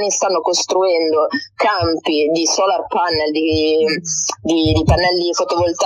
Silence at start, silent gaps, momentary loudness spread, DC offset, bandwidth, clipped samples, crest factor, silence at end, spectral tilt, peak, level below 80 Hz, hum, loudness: 0 s; none; 3 LU; under 0.1%; 11.5 kHz; under 0.1%; 14 dB; 0 s; -3.5 dB/octave; -2 dBFS; -34 dBFS; none; -16 LUFS